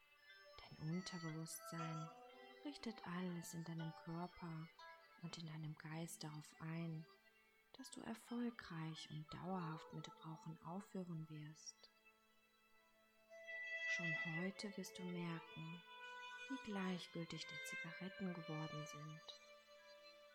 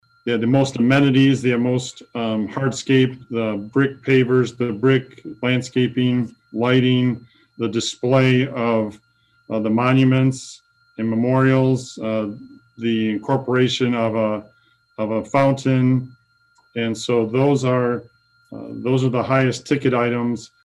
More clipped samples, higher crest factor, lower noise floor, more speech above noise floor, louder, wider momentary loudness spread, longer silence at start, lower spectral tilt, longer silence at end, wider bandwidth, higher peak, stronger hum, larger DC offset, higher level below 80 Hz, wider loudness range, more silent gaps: neither; about the same, 18 dB vs 14 dB; first, -76 dBFS vs -59 dBFS; second, 26 dB vs 41 dB; second, -50 LUFS vs -19 LUFS; first, 15 LU vs 12 LU; second, 0 s vs 0.25 s; second, -5 dB/octave vs -6.5 dB/octave; second, 0 s vs 0.2 s; first, 16.5 kHz vs 10.5 kHz; second, -34 dBFS vs -6 dBFS; neither; neither; second, -84 dBFS vs -60 dBFS; first, 6 LU vs 3 LU; neither